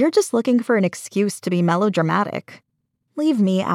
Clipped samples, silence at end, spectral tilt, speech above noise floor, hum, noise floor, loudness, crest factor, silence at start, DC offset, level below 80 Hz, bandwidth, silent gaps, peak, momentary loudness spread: under 0.1%; 0 s; -6 dB/octave; 53 dB; none; -72 dBFS; -20 LUFS; 16 dB; 0 s; under 0.1%; -88 dBFS; 15.5 kHz; none; -4 dBFS; 6 LU